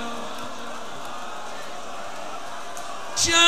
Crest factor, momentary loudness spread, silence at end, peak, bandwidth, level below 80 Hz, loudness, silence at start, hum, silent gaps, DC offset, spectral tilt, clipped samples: 24 dB; 9 LU; 0 s; -4 dBFS; 15.5 kHz; -56 dBFS; -30 LUFS; 0 s; none; none; 3%; -0.5 dB/octave; under 0.1%